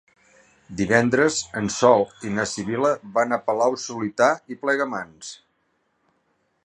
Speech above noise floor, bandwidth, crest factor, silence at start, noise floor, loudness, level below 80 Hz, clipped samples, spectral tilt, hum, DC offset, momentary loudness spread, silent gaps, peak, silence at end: 48 dB; 11 kHz; 20 dB; 0.7 s; -70 dBFS; -22 LUFS; -58 dBFS; under 0.1%; -4.5 dB/octave; none; under 0.1%; 12 LU; none; -2 dBFS; 1.3 s